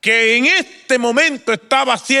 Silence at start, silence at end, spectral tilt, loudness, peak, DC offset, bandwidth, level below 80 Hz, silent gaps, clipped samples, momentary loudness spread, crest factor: 0.05 s; 0 s; -1.5 dB/octave; -14 LUFS; -2 dBFS; under 0.1%; 15 kHz; -70 dBFS; none; under 0.1%; 6 LU; 14 dB